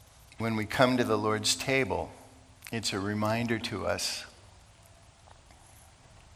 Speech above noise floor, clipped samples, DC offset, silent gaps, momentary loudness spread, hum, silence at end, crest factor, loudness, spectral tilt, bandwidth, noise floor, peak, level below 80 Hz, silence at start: 27 dB; under 0.1%; under 0.1%; none; 13 LU; none; 0 s; 24 dB; -29 LUFS; -4 dB/octave; 16.5 kHz; -56 dBFS; -8 dBFS; -60 dBFS; 0.4 s